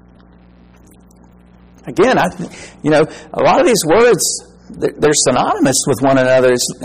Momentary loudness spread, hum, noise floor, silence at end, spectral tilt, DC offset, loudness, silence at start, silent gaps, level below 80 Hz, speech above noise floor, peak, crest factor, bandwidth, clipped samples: 12 LU; 60 Hz at -45 dBFS; -44 dBFS; 0 s; -3.5 dB/octave; under 0.1%; -13 LUFS; 1.85 s; none; -44 dBFS; 31 dB; -2 dBFS; 12 dB; 15.5 kHz; under 0.1%